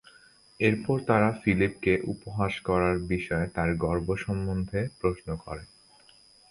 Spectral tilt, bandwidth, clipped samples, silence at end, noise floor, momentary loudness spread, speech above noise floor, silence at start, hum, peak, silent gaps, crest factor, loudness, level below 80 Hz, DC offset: -7.5 dB/octave; 11 kHz; under 0.1%; 0.85 s; -58 dBFS; 9 LU; 30 dB; 0.6 s; none; -8 dBFS; none; 20 dB; -28 LUFS; -46 dBFS; under 0.1%